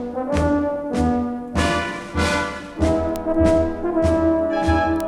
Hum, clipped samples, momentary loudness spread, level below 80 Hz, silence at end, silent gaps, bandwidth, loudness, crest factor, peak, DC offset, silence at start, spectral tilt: none; under 0.1%; 6 LU; -32 dBFS; 0 s; none; 16 kHz; -21 LUFS; 16 dB; -4 dBFS; under 0.1%; 0 s; -6 dB/octave